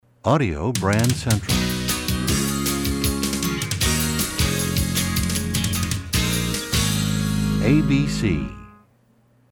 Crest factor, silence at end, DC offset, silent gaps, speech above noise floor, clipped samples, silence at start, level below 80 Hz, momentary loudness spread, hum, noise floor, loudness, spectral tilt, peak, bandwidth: 16 dB; 0.8 s; under 0.1%; none; 39 dB; under 0.1%; 0.25 s; -34 dBFS; 3 LU; none; -58 dBFS; -21 LUFS; -4.5 dB/octave; -6 dBFS; 19.5 kHz